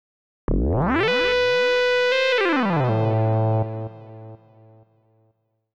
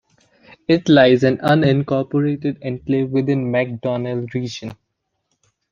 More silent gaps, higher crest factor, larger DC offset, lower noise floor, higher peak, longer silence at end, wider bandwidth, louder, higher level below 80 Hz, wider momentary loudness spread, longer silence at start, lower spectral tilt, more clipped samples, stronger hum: neither; second, 10 dB vs 18 dB; neither; second, -67 dBFS vs -74 dBFS; second, -12 dBFS vs 0 dBFS; first, 1.4 s vs 1 s; about the same, 7.8 kHz vs 7.2 kHz; about the same, -20 LUFS vs -18 LUFS; first, -36 dBFS vs -56 dBFS; about the same, 15 LU vs 14 LU; second, 0.5 s vs 0.7 s; about the same, -6.5 dB/octave vs -7.5 dB/octave; neither; neither